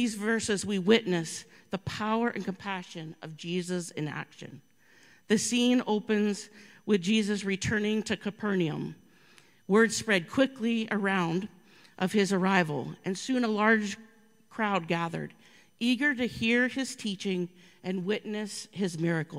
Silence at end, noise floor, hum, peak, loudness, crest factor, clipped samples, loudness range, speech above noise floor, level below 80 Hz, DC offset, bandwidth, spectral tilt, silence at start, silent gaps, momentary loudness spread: 0 s; -60 dBFS; none; -8 dBFS; -29 LUFS; 22 dB; under 0.1%; 5 LU; 31 dB; -66 dBFS; under 0.1%; 15 kHz; -4.5 dB/octave; 0 s; none; 15 LU